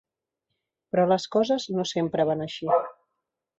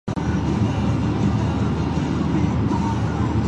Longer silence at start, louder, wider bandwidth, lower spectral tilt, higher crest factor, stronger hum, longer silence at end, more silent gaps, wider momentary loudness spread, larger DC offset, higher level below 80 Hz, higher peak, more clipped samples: first, 0.95 s vs 0.05 s; second, -25 LUFS vs -22 LUFS; about the same, 8 kHz vs 8.4 kHz; second, -5.5 dB/octave vs -7.5 dB/octave; first, 18 dB vs 12 dB; neither; first, 0.65 s vs 0 s; neither; first, 6 LU vs 2 LU; neither; second, -68 dBFS vs -30 dBFS; about the same, -8 dBFS vs -8 dBFS; neither